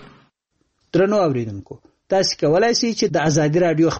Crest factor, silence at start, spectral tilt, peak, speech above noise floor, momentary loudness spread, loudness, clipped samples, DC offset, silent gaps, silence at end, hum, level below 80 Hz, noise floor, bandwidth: 12 dB; 0 s; -5 dB/octave; -6 dBFS; 52 dB; 8 LU; -18 LUFS; under 0.1%; under 0.1%; none; 0 s; none; -52 dBFS; -70 dBFS; 8.4 kHz